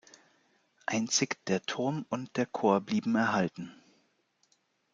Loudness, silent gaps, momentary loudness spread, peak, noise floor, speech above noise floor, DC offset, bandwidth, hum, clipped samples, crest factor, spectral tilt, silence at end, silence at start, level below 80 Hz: -31 LUFS; none; 8 LU; -12 dBFS; -73 dBFS; 43 dB; under 0.1%; 9.4 kHz; none; under 0.1%; 22 dB; -4 dB/octave; 1.2 s; 0.9 s; -78 dBFS